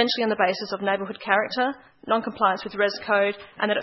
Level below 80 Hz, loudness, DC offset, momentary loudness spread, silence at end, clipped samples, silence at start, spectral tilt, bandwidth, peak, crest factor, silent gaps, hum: -68 dBFS; -24 LUFS; under 0.1%; 6 LU; 0 s; under 0.1%; 0 s; -5 dB/octave; 6 kHz; -4 dBFS; 20 dB; none; none